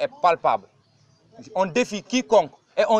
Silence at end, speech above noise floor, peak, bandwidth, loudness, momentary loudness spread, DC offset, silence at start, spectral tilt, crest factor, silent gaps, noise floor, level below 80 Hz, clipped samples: 0 s; 37 dB; -6 dBFS; 9.8 kHz; -23 LUFS; 9 LU; under 0.1%; 0 s; -4 dB/octave; 18 dB; none; -59 dBFS; -64 dBFS; under 0.1%